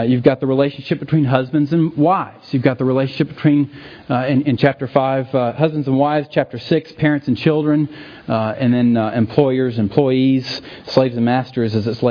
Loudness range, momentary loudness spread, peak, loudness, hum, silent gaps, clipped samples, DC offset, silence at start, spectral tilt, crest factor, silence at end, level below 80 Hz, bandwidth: 1 LU; 6 LU; 0 dBFS; -17 LUFS; none; none; under 0.1%; under 0.1%; 0 s; -9 dB/octave; 16 dB; 0 s; -54 dBFS; 5.4 kHz